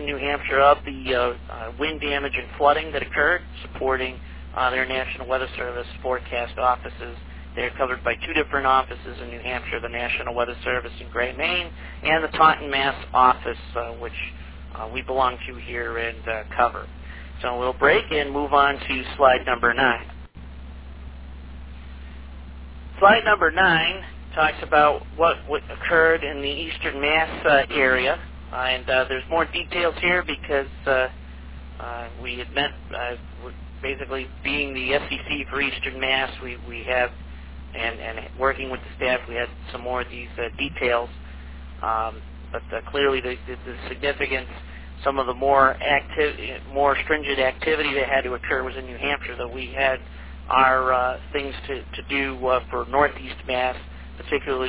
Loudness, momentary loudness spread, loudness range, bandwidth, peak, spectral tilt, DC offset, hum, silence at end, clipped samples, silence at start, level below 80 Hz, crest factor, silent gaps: -23 LUFS; 20 LU; 6 LU; 4 kHz; -2 dBFS; -8 dB/octave; 0.4%; none; 0 s; under 0.1%; 0 s; -40 dBFS; 22 dB; none